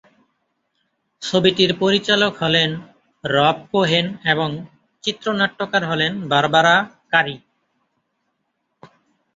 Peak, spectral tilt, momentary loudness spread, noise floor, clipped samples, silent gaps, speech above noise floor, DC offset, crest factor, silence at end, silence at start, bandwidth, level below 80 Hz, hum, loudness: -2 dBFS; -4.5 dB/octave; 11 LU; -73 dBFS; under 0.1%; none; 55 dB; under 0.1%; 20 dB; 0.5 s; 1.2 s; 7.8 kHz; -60 dBFS; none; -18 LUFS